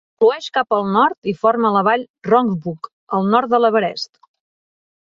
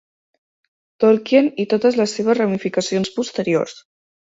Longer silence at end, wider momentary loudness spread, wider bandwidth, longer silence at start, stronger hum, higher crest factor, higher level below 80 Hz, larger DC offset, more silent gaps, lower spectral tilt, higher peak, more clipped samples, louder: first, 1 s vs 0.55 s; first, 10 LU vs 6 LU; about the same, 7.4 kHz vs 8 kHz; second, 0.2 s vs 1 s; neither; about the same, 16 dB vs 18 dB; about the same, -64 dBFS vs -62 dBFS; neither; first, 1.18-1.22 s, 2.10-2.14 s, 2.92-3.07 s vs none; first, -6.5 dB/octave vs -5 dB/octave; about the same, -2 dBFS vs -2 dBFS; neither; about the same, -17 LUFS vs -18 LUFS